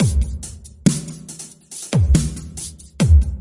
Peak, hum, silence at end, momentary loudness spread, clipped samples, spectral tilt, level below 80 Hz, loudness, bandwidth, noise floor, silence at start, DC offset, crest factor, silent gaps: -2 dBFS; none; 0 s; 18 LU; under 0.1%; -6 dB/octave; -22 dBFS; -19 LUFS; 11.5 kHz; -37 dBFS; 0 s; under 0.1%; 16 dB; none